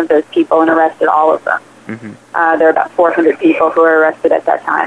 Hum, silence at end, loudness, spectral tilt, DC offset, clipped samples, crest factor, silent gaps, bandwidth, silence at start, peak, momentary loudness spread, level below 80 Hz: none; 0 s; -12 LUFS; -6 dB/octave; under 0.1%; under 0.1%; 12 dB; none; 10 kHz; 0 s; 0 dBFS; 11 LU; -62 dBFS